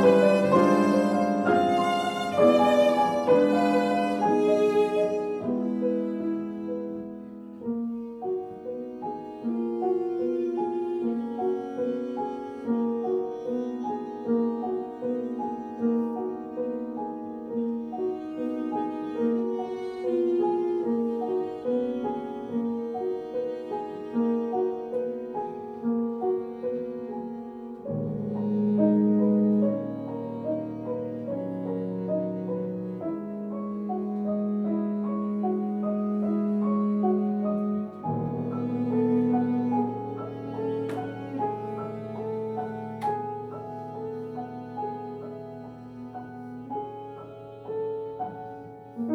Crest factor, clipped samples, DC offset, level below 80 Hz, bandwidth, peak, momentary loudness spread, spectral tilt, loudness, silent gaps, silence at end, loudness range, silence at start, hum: 20 dB; under 0.1%; under 0.1%; -68 dBFS; 12 kHz; -8 dBFS; 13 LU; -7.5 dB/octave; -28 LUFS; none; 0 s; 11 LU; 0 s; none